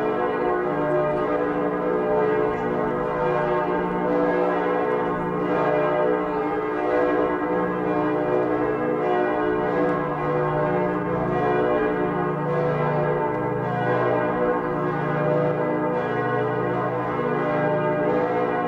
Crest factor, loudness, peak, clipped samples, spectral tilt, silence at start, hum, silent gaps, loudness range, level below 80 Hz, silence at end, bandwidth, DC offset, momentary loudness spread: 12 dB; -23 LUFS; -10 dBFS; under 0.1%; -9 dB/octave; 0 s; none; none; 1 LU; -50 dBFS; 0 s; 7 kHz; under 0.1%; 3 LU